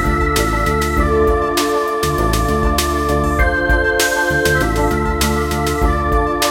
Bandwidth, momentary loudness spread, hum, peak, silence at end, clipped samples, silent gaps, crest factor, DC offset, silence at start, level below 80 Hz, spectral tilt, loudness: 17 kHz; 2 LU; none; -2 dBFS; 0 s; under 0.1%; none; 14 dB; under 0.1%; 0 s; -22 dBFS; -4.5 dB/octave; -16 LUFS